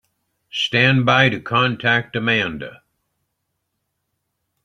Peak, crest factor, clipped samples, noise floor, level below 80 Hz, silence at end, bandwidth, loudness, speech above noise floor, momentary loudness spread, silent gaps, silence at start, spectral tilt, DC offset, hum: -2 dBFS; 20 dB; under 0.1%; -75 dBFS; -56 dBFS; 1.9 s; 7.6 kHz; -17 LUFS; 57 dB; 13 LU; none; 0.55 s; -5.5 dB/octave; under 0.1%; none